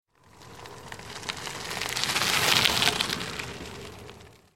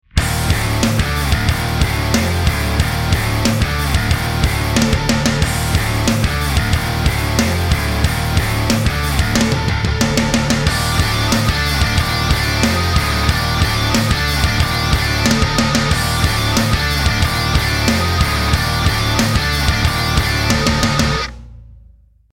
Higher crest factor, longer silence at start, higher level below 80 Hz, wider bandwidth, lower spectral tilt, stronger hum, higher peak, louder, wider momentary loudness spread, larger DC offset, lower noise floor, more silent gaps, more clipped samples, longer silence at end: first, 30 dB vs 16 dB; first, 0.35 s vs 0.15 s; second, -54 dBFS vs -24 dBFS; about the same, 17 kHz vs 16.5 kHz; second, -1.5 dB/octave vs -4.5 dB/octave; neither; about the same, 0 dBFS vs 0 dBFS; second, -25 LUFS vs -16 LUFS; first, 23 LU vs 2 LU; first, 0.1% vs under 0.1%; first, -52 dBFS vs -47 dBFS; neither; neither; second, 0.2 s vs 0.6 s